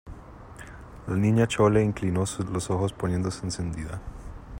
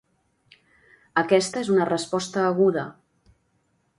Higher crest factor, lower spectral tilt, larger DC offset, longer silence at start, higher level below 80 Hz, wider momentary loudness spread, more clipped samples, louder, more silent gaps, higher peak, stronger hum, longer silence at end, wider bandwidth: about the same, 20 dB vs 20 dB; first, -6.5 dB/octave vs -5 dB/octave; neither; second, 0.05 s vs 1.15 s; first, -46 dBFS vs -66 dBFS; first, 23 LU vs 7 LU; neither; second, -26 LUFS vs -23 LUFS; neither; about the same, -8 dBFS vs -6 dBFS; neither; second, 0 s vs 1.05 s; first, 16 kHz vs 11.5 kHz